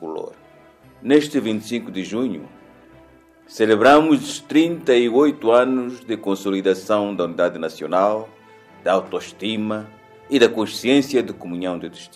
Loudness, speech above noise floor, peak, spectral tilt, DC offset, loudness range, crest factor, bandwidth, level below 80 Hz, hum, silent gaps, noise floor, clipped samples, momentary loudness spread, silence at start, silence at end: -19 LUFS; 31 dB; -2 dBFS; -5 dB/octave; under 0.1%; 6 LU; 18 dB; 15 kHz; -64 dBFS; none; none; -50 dBFS; under 0.1%; 13 LU; 0 s; 0.1 s